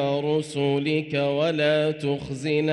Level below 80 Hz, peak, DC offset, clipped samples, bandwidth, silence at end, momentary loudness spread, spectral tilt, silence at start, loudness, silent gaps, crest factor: -60 dBFS; -12 dBFS; under 0.1%; under 0.1%; 11.5 kHz; 0 s; 6 LU; -6 dB/octave; 0 s; -24 LUFS; none; 12 dB